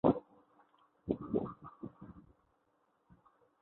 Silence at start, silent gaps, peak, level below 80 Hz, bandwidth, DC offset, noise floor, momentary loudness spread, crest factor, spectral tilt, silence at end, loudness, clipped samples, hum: 0.05 s; none; -14 dBFS; -64 dBFS; 4 kHz; under 0.1%; -77 dBFS; 20 LU; 26 dB; -9 dB/octave; 1.4 s; -40 LUFS; under 0.1%; none